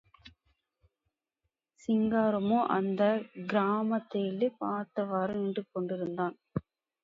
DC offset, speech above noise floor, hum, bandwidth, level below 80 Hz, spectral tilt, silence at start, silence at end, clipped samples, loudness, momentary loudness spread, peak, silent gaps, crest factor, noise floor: under 0.1%; 55 dB; none; 7.4 kHz; -68 dBFS; -8.5 dB/octave; 0.25 s; 0.45 s; under 0.1%; -31 LUFS; 8 LU; -14 dBFS; none; 18 dB; -85 dBFS